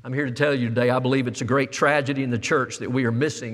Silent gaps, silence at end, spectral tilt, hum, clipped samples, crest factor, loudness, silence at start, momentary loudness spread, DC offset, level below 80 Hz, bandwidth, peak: none; 0 s; -5.5 dB/octave; none; under 0.1%; 18 dB; -22 LUFS; 0.05 s; 5 LU; under 0.1%; -66 dBFS; 12.5 kHz; -4 dBFS